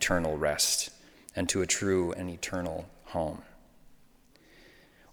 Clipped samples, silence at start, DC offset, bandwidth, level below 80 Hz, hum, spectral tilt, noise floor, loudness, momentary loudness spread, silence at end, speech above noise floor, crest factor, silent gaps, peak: under 0.1%; 0 s; under 0.1%; over 20 kHz; -54 dBFS; none; -3 dB/octave; -60 dBFS; -30 LUFS; 14 LU; 0.5 s; 30 dB; 20 dB; none; -12 dBFS